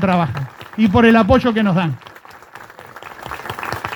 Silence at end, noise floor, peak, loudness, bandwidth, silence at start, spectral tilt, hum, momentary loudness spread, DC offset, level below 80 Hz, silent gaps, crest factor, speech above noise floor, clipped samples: 0 s; -40 dBFS; 0 dBFS; -15 LUFS; 19.5 kHz; 0 s; -7.5 dB/octave; none; 24 LU; under 0.1%; -40 dBFS; none; 18 dB; 26 dB; under 0.1%